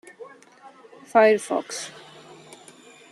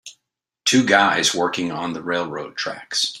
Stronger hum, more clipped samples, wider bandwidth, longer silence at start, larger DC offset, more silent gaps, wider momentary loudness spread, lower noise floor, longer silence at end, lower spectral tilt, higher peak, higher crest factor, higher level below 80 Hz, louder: neither; neither; about the same, 12.5 kHz vs 13.5 kHz; first, 0.2 s vs 0.05 s; neither; neither; first, 28 LU vs 12 LU; second, -50 dBFS vs -79 dBFS; first, 1.2 s vs 0 s; about the same, -3.5 dB/octave vs -2.5 dB/octave; second, -6 dBFS vs 0 dBFS; about the same, 20 dB vs 20 dB; second, -80 dBFS vs -62 dBFS; about the same, -21 LUFS vs -20 LUFS